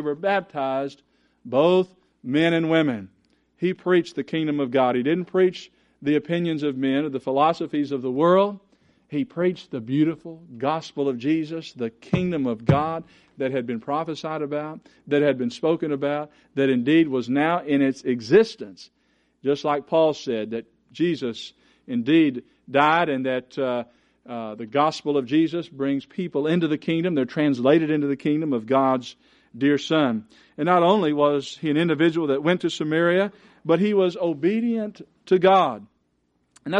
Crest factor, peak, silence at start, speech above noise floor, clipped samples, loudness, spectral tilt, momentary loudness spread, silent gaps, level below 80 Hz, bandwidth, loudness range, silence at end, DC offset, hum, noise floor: 20 dB; -2 dBFS; 0 s; 47 dB; under 0.1%; -23 LUFS; -7 dB/octave; 13 LU; none; -62 dBFS; 9.2 kHz; 4 LU; 0 s; under 0.1%; none; -69 dBFS